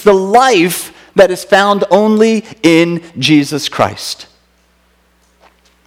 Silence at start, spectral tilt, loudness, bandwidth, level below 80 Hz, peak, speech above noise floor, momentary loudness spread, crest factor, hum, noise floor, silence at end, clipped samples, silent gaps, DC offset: 0 s; -4.5 dB/octave; -11 LUFS; 16.5 kHz; -50 dBFS; 0 dBFS; 43 dB; 8 LU; 12 dB; none; -53 dBFS; 1.65 s; 0.8%; none; under 0.1%